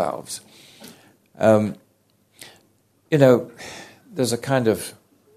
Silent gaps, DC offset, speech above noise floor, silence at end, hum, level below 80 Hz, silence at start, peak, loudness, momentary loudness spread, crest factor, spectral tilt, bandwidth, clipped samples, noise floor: none; under 0.1%; 43 dB; 0.45 s; none; -64 dBFS; 0 s; 0 dBFS; -20 LUFS; 21 LU; 22 dB; -6 dB/octave; 14.5 kHz; under 0.1%; -63 dBFS